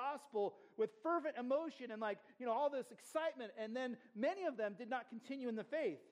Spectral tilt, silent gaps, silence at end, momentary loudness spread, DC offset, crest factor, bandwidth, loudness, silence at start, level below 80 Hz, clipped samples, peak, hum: -5 dB/octave; none; 0.1 s; 7 LU; under 0.1%; 16 dB; 14.5 kHz; -43 LUFS; 0 s; under -90 dBFS; under 0.1%; -28 dBFS; none